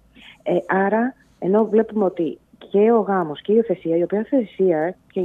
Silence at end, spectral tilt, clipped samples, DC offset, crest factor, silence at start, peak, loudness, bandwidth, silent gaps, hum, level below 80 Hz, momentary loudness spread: 0 s; -9 dB/octave; under 0.1%; under 0.1%; 14 dB; 0.45 s; -6 dBFS; -20 LUFS; 3.9 kHz; none; none; -64 dBFS; 10 LU